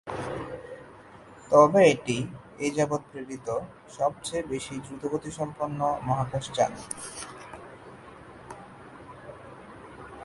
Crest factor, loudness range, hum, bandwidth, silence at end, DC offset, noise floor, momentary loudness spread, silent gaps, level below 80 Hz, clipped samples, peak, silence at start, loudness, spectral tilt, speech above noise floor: 24 dB; 11 LU; none; 11.5 kHz; 0 s; under 0.1%; -49 dBFS; 25 LU; none; -58 dBFS; under 0.1%; -4 dBFS; 0.05 s; -27 LUFS; -5 dB/octave; 23 dB